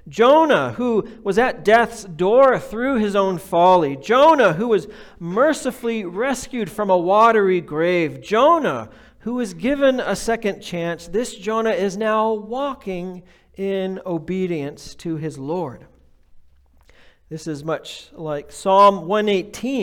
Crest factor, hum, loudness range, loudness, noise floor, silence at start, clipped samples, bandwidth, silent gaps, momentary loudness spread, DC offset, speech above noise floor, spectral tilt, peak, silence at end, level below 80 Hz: 16 dB; none; 12 LU; -19 LUFS; -52 dBFS; 0.05 s; under 0.1%; 18 kHz; none; 15 LU; under 0.1%; 33 dB; -5.5 dB/octave; -4 dBFS; 0 s; -50 dBFS